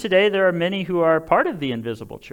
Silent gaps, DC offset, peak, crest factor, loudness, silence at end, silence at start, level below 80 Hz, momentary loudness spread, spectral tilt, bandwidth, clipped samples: none; under 0.1%; -4 dBFS; 16 dB; -20 LUFS; 0.05 s; 0 s; -54 dBFS; 11 LU; -6.5 dB/octave; 17.5 kHz; under 0.1%